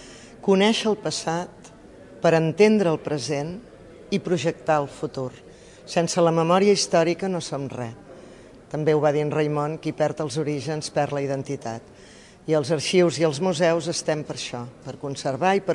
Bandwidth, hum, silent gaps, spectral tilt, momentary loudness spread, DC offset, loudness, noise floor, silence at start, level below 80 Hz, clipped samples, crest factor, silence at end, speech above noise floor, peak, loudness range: 11.5 kHz; none; none; -5 dB/octave; 15 LU; under 0.1%; -23 LUFS; -46 dBFS; 0 s; -60 dBFS; under 0.1%; 18 dB; 0 s; 23 dB; -6 dBFS; 4 LU